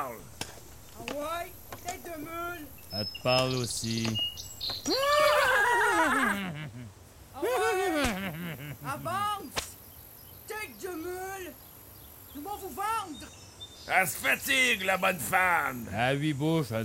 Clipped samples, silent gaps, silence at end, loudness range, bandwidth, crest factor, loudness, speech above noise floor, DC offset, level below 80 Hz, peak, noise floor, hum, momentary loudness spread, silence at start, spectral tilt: under 0.1%; none; 0 s; 11 LU; 16 kHz; 22 dB; -29 LUFS; 20 dB; under 0.1%; -56 dBFS; -10 dBFS; -50 dBFS; none; 22 LU; 0 s; -3.5 dB/octave